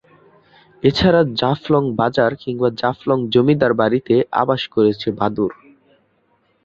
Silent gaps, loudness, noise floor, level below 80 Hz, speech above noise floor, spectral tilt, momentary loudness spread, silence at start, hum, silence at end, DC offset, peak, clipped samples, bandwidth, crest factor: none; -17 LUFS; -62 dBFS; -46 dBFS; 45 dB; -7.5 dB/octave; 6 LU; 0.85 s; none; 1.1 s; under 0.1%; -2 dBFS; under 0.1%; 7.4 kHz; 16 dB